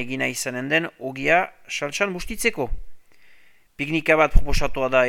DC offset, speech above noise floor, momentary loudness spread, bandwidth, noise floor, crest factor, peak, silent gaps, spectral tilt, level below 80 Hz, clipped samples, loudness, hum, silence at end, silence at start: under 0.1%; 35 dB; 12 LU; 16 kHz; -56 dBFS; 22 dB; 0 dBFS; none; -4 dB/octave; -28 dBFS; under 0.1%; -23 LUFS; none; 0 s; 0 s